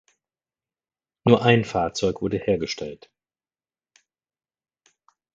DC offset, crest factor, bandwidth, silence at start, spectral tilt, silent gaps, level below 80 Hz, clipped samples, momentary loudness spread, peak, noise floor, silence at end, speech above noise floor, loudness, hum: under 0.1%; 26 dB; 7.8 kHz; 1.25 s; -6 dB/octave; none; -54 dBFS; under 0.1%; 13 LU; 0 dBFS; under -90 dBFS; 2.4 s; over 68 dB; -22 LUFS; none